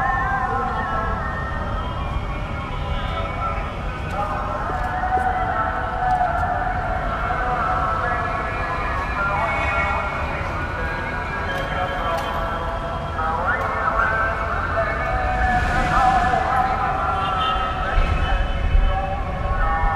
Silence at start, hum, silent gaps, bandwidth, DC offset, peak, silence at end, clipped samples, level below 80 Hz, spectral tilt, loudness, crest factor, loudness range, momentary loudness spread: 0 s; none; none; 12.5 kHz; under 0.1%; -6 dBFS; 0 s; under 0.1%; -28 dBFS; -6 dB/octave; -22 LUFS; 16 dB; 5 LU; 6 LU